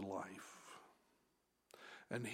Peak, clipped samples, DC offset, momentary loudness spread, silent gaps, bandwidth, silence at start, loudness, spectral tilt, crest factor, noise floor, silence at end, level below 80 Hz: -30 dBFS; under 0.1%; under 0.1%; 17 LU; none; 16 kHz; 0 s; -52 LUFS; -5 dB/octave; 22 dB; -82 dBFS; 0 s; under -90 dBFS